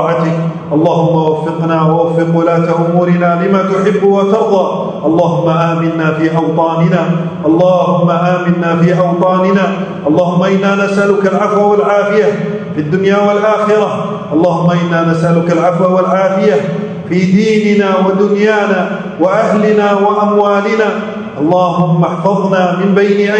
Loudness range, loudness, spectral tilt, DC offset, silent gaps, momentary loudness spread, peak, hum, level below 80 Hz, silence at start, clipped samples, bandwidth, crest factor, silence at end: 1 LU; -11 LUFS; -7.5 dB/octave; under 0.1%; none; 5 LU; 0 dBFS; none; -54 dBFS; 0 s; 0.1%; 8.6 kHz; 10 dB; 0 s